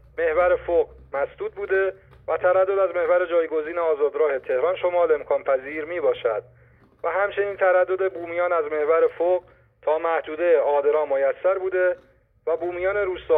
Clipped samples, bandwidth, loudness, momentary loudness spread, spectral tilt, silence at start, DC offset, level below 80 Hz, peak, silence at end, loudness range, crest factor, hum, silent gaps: under 0.1%; 3.9 kHz; -23 LUFS; 8 LU; -8 dB/octave; 0.15 s; under 0.1%; -56 dBFS; -8 dBFS; 0 s; 2 LU; 14 dB; none; none